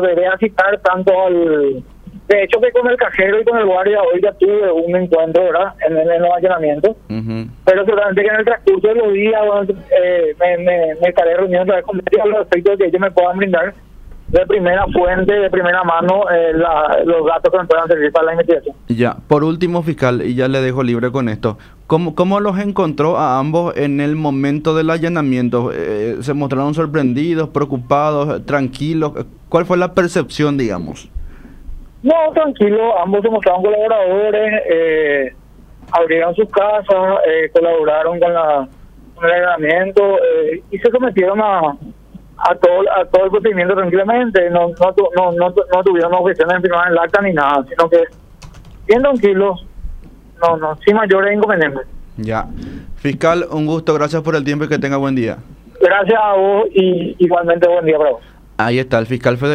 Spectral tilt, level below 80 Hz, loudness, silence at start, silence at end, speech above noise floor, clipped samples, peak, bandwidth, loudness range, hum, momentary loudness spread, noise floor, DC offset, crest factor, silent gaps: -7 dB/octave; -40 dBFS; -14 LUFS; 0 s; 0 s; 26 dB; under 0.1%; 0 dBFS; 10 kHz; 3 LU; none; 6 LU; -39 dBFS; under 0.1%; 14 dB; none